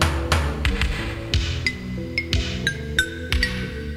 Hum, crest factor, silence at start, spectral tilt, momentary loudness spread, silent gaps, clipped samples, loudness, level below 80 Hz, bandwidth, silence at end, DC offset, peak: none; 20 dB; 0 s; -4.5 dB/octave; 5 LU; none; under 0.1%; -24 LUFS; -28 dBFS; 15 kHz; 0 s; under 0.1%; -4 dBFS